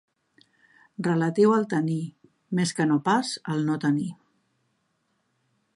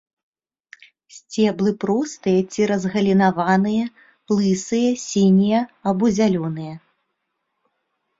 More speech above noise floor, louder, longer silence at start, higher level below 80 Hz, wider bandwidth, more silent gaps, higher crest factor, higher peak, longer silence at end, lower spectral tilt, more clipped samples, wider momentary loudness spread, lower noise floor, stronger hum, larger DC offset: second, 49 dB vs 57 dB; second, -25 LUFS vs -19 LUFS; second, 1 s vs 1.15 s; second, -74 dBFS vs -58 dBFS; first, 11.5 kHz vs 7.8 kHz; neither; about the same, 18 dB vs 16 dB; second, -10 dBFS vs -4 dBFS; first, 1.6 s vs 1.4 s; about the same, -6 dB/octave vs -6 dB/octave; neither; first, 11 LU vs 8 LU; about the same, -73 dBFS vs -75 dBFS; neither; neither